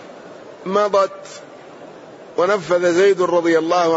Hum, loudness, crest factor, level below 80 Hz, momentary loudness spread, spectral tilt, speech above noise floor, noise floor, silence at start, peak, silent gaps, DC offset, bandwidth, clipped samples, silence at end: none; -17 LUFS; 14 dB; -68 dBFS; 24 LU; -5 dB/octave; 22 dB; -39 dBFS; 0 s; -4 dBFS; none; under 0.1%; 8 kHz; under 0.1%; 0 s